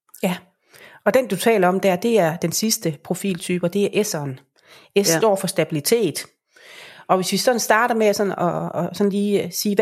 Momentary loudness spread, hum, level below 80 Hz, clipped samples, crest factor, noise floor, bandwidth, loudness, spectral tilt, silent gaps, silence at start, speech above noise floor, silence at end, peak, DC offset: 9 LU; none; -68 dBFS; under 0.1%; 18 dB; -49 dBFS; 16 kHz; -20 LUFS; -4 dB/octave; none; 0.2 s; 29 dB; 0 s; -2 dBFS; under 0.1%